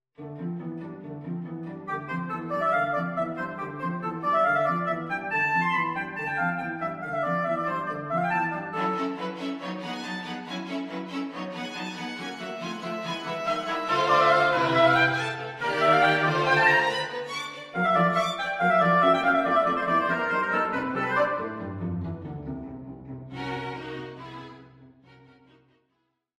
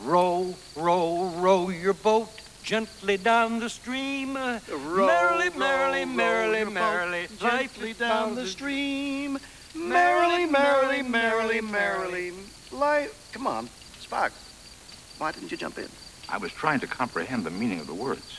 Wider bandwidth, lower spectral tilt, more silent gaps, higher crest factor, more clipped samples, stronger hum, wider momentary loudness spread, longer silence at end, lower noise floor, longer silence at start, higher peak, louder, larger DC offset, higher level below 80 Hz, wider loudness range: first, 13.5 kHz vs 11 kHz; first, -5.5 dB/octave vs -4 dB/octave; neither; about the same, 20 dB vs 18 dB; neither; neither; about the same, 16 LU vs 14 LU; first, 1.5 s vs 0 s; first, -76 dBFS vs -47 dBFS; first, 0.2 s vs 0 s; about the same, -6 dBFS vs -8 dBFS; about the same, -26 LUFS vs -26 LUFS; neither; about the same, -62 dBFS vs -58 dBFS; first, 11 LU vs 7 LU